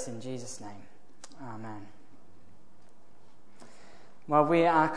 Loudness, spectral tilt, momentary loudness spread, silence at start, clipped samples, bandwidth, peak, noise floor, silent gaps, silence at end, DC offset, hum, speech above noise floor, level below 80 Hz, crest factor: -28 LUFS; -5.5 dB/octave; 29 LU; 0 s; under 0.1%; 10.5 kHz; -10 dBFS; -62 dBFS; none; 0 s; 0.9%; none; 33 dB; -74 dBFS; 22 dB